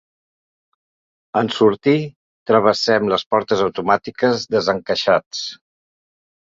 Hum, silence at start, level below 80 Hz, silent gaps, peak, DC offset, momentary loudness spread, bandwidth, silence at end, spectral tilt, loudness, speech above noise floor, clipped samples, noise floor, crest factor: none; 1.35 s; -58 dBFS; 2.16-2.46 s, 3.26-3.30 s, 5.26-5.31 s; -2 dBFS; under 0.1%; 10 LU; 7.6 kHz; 1.05 s; -5 dB/octave; -18 LUFS; over 73 dB; under 0.1%; under -90 dBFS; 18 dB